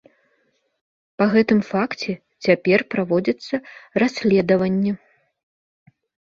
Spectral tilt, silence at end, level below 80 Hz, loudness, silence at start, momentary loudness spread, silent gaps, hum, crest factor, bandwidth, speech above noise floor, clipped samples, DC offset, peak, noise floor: -7 dB/octave; 1.3 s; -60 dBFS; -20 LUFS; 1.2 s; 11 LU; none; none; 20 dB; 7.4 kHz; 48 dB; under 0.1%; under 0.1%; -2 dBFS; -67 dBFS